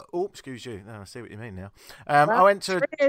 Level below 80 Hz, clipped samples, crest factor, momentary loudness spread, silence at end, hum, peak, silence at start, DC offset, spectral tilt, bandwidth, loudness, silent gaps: -64 dBFS; under 0.1%; 18 dB; 22 LU; 0 s; none; -6 dBFS; 0 s; under 0.1%; -5 dB/octave; 15.5 kHz; -22 LUFS; none